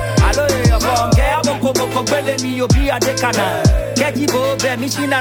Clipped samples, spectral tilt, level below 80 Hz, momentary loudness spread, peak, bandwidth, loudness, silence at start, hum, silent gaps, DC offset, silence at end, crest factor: under 0.1%; -4.5 dB/octave; -22 dBFS; 4 LU; -2 dBFS; 19 kHz; -15 LUFS; 0 s; none; none; under 0.1%; 0 s; 12 dB